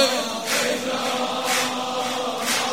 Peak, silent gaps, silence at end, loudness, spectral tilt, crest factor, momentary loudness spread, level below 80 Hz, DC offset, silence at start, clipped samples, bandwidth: -6 dBFS; none; 0 s; -23 LUFS; -1 dB/octave; 18 dB; 3 LU; -68 dBFS; 0.3%; 0 s; under 0.1%; 16.5 kHz